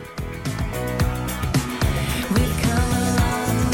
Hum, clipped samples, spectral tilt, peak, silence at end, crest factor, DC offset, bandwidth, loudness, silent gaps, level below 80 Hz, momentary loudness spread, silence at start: none; under 0.1%; -5 dB/octave; -8 dBFS; 0 s; 14 dB; under 0.1%; 18 kHz; -22 LUFS; none; -30 dBFS; 7 LU; 0 s